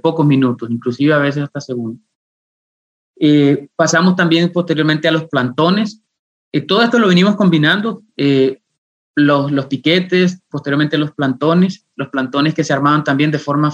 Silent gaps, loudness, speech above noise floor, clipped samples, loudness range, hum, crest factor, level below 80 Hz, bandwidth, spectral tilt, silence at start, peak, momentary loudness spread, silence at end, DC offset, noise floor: 2.15-3.14 s, 6.19-6.51 s, 8.78-9.14 s; -14 LUFS; over 76 dB; under 0.1%; 3 LU; none; 14 dB; -64 dBFS; 8.4 kHz; -6 dB/octave; 0.05 s; -2 dBFS; 11 LU; 0 s; under 0.1%; under -90 dBFS